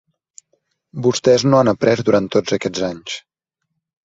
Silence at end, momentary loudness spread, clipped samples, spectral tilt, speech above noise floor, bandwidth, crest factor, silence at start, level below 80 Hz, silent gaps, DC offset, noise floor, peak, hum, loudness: 0.85 s; 16 LU; under 0.1%; -5.5 dB/octave; 60 dB; 8 kHz; 18 dB; 0.95 s; -54 dBFS; none; under 0.1%; -76 dBFS; -2 dBFS; none; -16 LUFS